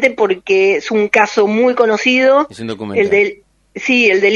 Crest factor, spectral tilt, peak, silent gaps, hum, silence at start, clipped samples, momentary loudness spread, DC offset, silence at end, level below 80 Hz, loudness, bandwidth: 14 dB; -4 dB/octave; 0 dBFS; none; none; 0 s; under 0.1%; 8 LU; under 0.1%; 0 s; -56 dBFS; -13 LUFS; 9.6 kHz